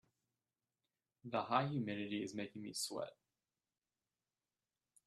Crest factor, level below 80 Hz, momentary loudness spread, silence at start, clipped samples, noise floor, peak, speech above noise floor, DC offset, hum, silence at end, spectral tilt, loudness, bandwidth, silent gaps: 28 dB; -84 dBFS; 10 LU; 1.25 s; under 0.1%; under -90 dBFS; -18 dBFS; over 48 dB; under 0.1%; none; 1.95 s; -4.5 dB/octave; -42 LUFS; 13 kHz; none